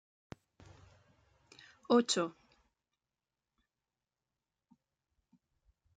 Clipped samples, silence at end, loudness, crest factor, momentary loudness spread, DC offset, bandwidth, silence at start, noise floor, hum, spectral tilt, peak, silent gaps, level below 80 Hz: under 0.1%; 3.65 s; -32 LUFS; 24 dB; 27 LU; under 0.1%; 9 kHz; 1.9 s; under -90 dBFS; none; -3.5 dB/octave; -18 dBFS; none; -76 dBFS